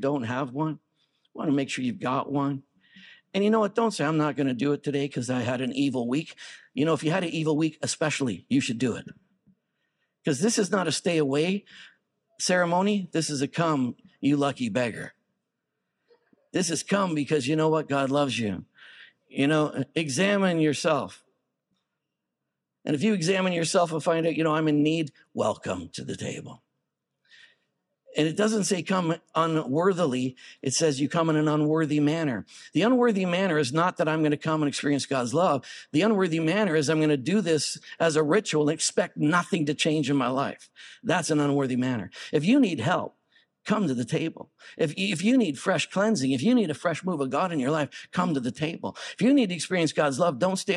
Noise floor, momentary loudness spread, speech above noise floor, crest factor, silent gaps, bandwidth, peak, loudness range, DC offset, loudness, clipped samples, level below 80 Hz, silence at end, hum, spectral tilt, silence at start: -84 dBFS; 9 LU; 59 dB; 18 dB; none; 12 kHz; -8 dBFS; 4 LU; under 0.1%; -26 LUFS; under 0.1%; -74 dBFS; 0 s; none; -5 dB/octave; 0 s